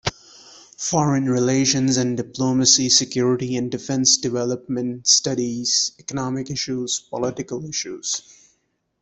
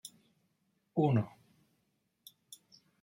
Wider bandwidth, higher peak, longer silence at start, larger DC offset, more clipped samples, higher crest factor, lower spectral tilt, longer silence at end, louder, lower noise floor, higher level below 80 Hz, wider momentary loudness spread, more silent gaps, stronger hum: second, 8.4 kHz vs 16.5 kHz; first, -2 dBFS vs -16 dBFS; about the same, 0.05 s vs 0.05 s; neither; neither; about the same, 20 dB vs 22 dB; second, -3 dB/octave vs -7.5 dB/octave; second, 0.8 s vs 1.75 s; first, -20 LUFS vs -33 LUFS; second, -69 dBFS vs -79 dBFS; first, -56 dBFS vs -76 dBFS; second, 11 LU vs 24 LU; neither; neither